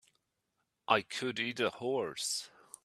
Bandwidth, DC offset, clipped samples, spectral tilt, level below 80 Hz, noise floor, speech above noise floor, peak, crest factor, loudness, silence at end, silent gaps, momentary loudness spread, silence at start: 14 kHz; under 0.1%; under 0.1%; -2.5 dB/octave; -78 dBFS; -83 dBFS; 48 dB; -10 dBFS; 26 dB; -34 LUFS; 0.35 s; none; 8 LU; 0.9 s